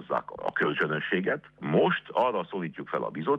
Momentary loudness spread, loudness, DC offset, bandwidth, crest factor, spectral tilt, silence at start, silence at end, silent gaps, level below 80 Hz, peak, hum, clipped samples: 8 LU; -28 LUFS; under 0.1%; 6.6 kHz; 16 dB; -8 dB/octave; 0 s; 0 s; none; -68 dBFS; -12 dBFS; none; under 0.1%